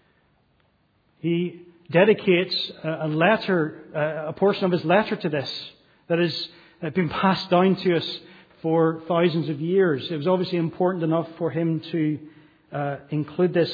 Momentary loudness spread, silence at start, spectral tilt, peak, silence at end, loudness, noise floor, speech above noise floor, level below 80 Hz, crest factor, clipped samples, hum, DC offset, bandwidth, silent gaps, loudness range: 11 LU; 1.25 s; -8 dB/octave; -4 dBFS; 0 s; -23 LUFS; -65 dBFS; 42 dB; -66 dBFS; 20 dB; under 0.1%; none; under 0.1%; 5 kHz; none; 2 LU